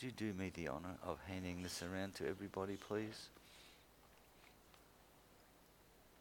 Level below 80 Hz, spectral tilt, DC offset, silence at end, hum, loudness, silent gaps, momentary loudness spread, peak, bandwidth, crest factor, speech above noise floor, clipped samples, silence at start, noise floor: -70 dBFS; -5 dB/octave; under 0.1%; 0 s; none; -47 LUFS; none; 22 LU; -28 dBFS; 19 kHz; 22 dB; 22 dB; under 0.1%; 0 s; -68 dBFS